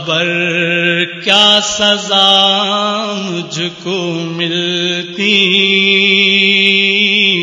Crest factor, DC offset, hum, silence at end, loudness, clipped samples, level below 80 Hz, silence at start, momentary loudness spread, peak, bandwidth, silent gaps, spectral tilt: 12 dB; under 0.1%; none; 0 s; -10 LUFS; 0.2%; -56 dBFS; 0 s; 10 LU; 0 dBFS; 11 kHz; none; -3 dB/octave